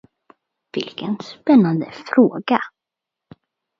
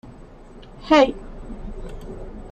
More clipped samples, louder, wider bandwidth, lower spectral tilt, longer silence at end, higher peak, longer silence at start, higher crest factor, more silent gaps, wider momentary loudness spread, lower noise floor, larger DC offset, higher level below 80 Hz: neither; about the same, -19 LUFS vs -18 LUFS; second, 7 kHz vs 9 kHz; first, -7.5 dB/octave vs -5.5 dB/octave; first, 1.1 s vs 0 s; about the same, 0 dBFS vs -2 dBFS; first, 0.75 s vs 0.05 s; about the same, 20 dB vs 22 dB; neither; second, 14 LU vs 22 LU; first, -85 dBFS vs -42 dBFS; neither; second, -68 dBFS vs -38 dBFS